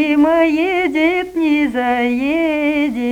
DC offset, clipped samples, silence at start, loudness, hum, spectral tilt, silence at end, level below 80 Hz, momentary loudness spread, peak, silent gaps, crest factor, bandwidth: under 0.1%; under 0.1%; 0 s; -15 LUFS; none; -5 dB/octave; 0 s; -48 dBFS; 4 LU; -2 dBFS; none; 12 dB; 12.5 kHz